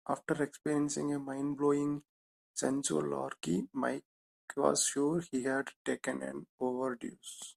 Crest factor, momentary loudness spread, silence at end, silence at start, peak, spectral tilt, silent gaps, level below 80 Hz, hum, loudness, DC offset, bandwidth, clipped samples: 22 dB; 12 LU; 0.05 s; 0.05 s; -12 dBFS; -4 dB/octave; 2.09-2.54 s, 4.05-4.48 s, 5.76-5.85 s, 6.49-6.58 s; -74 dBFS; none; -35 LUFS; under 0.1%; 14.5 kHz; under 0.1%